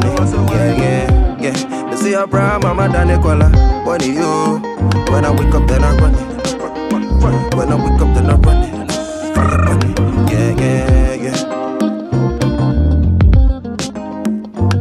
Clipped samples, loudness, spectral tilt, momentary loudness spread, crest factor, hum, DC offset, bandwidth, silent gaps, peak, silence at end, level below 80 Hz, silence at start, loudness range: under 0.1%; -14 LUFS; -7 dB/octave; 9 LU; 12 dB; none; under 0.1%; 13.5 kHz; none; 0 dBFS; 0 s; -16 dBFS; 0 s; 2 LU